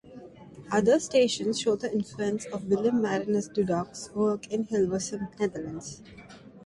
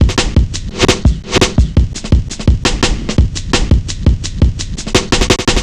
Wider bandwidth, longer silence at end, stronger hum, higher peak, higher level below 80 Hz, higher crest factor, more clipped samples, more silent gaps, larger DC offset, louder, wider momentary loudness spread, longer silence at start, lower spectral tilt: about the same, 11.5 kHz vs 12 kHz; about the same, 0.05 s vs 0 s; neither; second, -10 dBFS vs 0 dBFS; second, -62 dBFS vs -16 dBFS; first, 18 dB vs 12 dB; neither; neither; neither; second, -28 LUFS vs -14 LUFS; first, 22 LU vs 4 LU; about the same, 0.05 s vs 0 s; about the same, -5 dB/octave vs -4.5 dB/octave